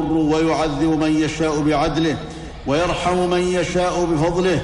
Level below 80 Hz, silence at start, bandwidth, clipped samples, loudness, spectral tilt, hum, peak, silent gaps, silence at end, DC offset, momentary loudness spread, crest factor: -36 dBFS; 0 s; 11 kHz; under 0.1%; -19 LUFS; -5.5 dB/octave; none; -6 dBFS; none; 0 s; under 0.1%; 4 LU; 12 dB